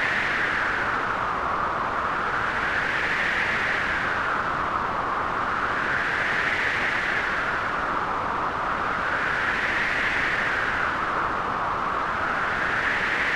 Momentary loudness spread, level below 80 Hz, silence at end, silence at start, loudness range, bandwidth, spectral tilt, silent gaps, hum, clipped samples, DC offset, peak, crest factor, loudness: 3 LU; -46 dBFS; 0 s; 0 s; 0 LU; 15.5 kHz; -4 dB/octave; none; none; under 0.1%; under 0.1%; -12 dBFS; 14 dB; -24 LUFS